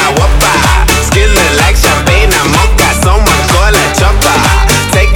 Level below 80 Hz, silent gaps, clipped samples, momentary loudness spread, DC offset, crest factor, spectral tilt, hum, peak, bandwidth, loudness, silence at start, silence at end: -10 dBFS; none; 2%; 1 LU; 0.2%; 6 dB; -3.5 dB/octave; none; 0 dBFS; 19 kHz; -7 LUFS; 0 s; 0 s